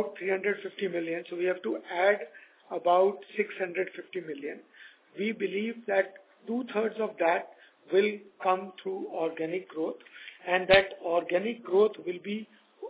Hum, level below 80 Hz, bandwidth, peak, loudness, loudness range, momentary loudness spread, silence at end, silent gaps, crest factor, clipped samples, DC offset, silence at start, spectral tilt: none; -66 dBFS; 4 kHz; -6 dBFS; -30 LUFS; 5 LU; 13 LU; 0 s; none; 24 dB; under 0.1%; under 0.1%; 0 s; -8.5 dB/octave